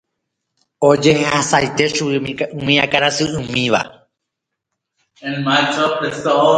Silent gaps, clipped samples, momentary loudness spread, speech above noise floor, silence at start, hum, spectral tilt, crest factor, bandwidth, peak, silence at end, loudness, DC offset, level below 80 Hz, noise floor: none; under 0.1%; 9 LU; 63 dB; 0.8 s; none; -4 dB/octave; 18 dB; 10.5 kHz; 0 dBFS; 0 s; -16 LUFS; under 0.1%; -52 dBFS; -79 dBFS